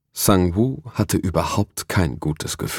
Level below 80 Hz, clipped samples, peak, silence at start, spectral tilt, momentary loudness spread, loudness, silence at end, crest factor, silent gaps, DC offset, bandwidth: -40 dBFS; under 0.1%; -2 dBFS; 0.15 s; -5 dB/octave; 8 LU; -21 LUFS; 0 s; 20 dB; none; under 0.1%; 18.5 kHz